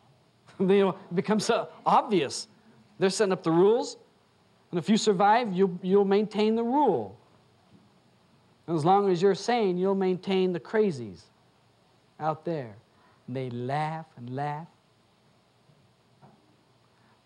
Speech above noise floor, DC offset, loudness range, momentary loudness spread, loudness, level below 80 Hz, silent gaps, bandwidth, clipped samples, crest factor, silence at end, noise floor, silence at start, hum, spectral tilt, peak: 39 dB; under 0.1%; 11 LU; 14 LU; -26 LUFS; -78 dBFS; none; 11.5 kHz; under 0.1%; 18 dB; 2.6 s; -64 dBFS; 0.6 s; none; -6 dB/octave; -10 dBFS